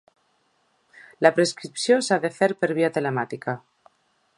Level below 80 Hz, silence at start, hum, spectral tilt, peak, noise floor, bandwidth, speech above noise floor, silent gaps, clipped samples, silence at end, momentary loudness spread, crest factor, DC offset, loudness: -74 dBFS; 1.2 s; none; -4.5 dB/octave; 0 dBFS; -67 dBFS; 11.5 kHz; 45 dB; none; under 0.1%; 0.8 s; 11 LU; 24 dB; under 0.1%; -23 LUFS